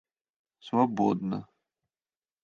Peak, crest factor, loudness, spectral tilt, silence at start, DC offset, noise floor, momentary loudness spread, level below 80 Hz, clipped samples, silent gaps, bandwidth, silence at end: -10 dBFS; 22 dB; -29 LUFS; -8 dB/octave; 0.65 s; under 0.1%; under -90 dBFS; 10 LU; -70 dBFS; under 0.1%; none; 7 kHz; 1 s